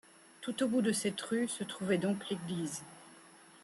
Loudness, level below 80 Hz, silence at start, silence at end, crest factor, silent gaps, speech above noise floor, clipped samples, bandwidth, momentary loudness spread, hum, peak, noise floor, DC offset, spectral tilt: -35 LUFS; -78 dBFS; 0.4 s; 0.05 s; 16 dB; none; 24 dB; under 0.1%; 13 kHz; 14 LU; none; -20 dBFS; -58 dBFS; under 0.1%; -4.5 dB/octave